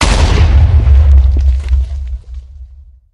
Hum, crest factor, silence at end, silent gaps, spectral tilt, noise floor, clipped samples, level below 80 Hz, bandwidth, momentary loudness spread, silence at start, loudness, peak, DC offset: none; 10 dB; 0.5 s; none; -5.5 dB/octave; -36 dBFS; 0.2%; -10 dBFS; 10.5 kHz; 18 LU; 0 s; -10 LUFS; 0 dBFS; under 0.1%